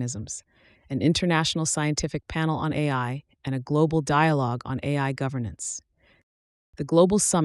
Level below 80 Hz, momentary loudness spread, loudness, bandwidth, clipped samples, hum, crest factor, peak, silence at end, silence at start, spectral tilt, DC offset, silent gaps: -50 dBFS; 13 LU; -25 LUFS; 13 kHz; under 0.1%; none; 18 dB; -6 dBFS; 0 s; 0 s; -5 dB/octave; under 0.1%; 6.23-6.73 s